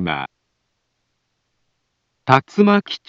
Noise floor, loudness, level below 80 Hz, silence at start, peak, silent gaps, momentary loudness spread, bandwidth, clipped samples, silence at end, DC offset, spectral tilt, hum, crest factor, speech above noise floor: -72 dBFS; -17 LUFS; -58 dBFS; 0 s; 0 dBFS; none; 16 LU; 7.4 kHz; under 0.1%; 0.1 s; under 0.1%; -7 dB/octave; none; 22 dB; 55 dB